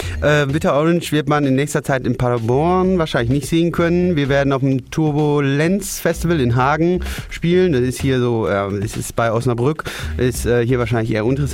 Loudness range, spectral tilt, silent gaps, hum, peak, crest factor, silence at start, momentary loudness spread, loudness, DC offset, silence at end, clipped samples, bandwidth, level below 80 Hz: 2 LU; -6.5 dB/octave; none; none; -4 dBFS; 12 dB; 0 s; 5 LU; -17 LUFS; under 0.1%; 0 s; under 0.1%; 16.5 kHz; -34 dBFS